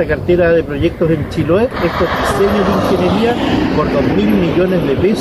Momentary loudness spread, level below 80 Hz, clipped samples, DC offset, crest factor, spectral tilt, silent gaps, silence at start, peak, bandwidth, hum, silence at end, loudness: 3 LU; -30 dBFS; under 0.1%; under 0.1%; 12 dB; -7 dB/octave; none; 0 s; -2 dBFS; 15 kHz; none; 0 s; -14 LUFS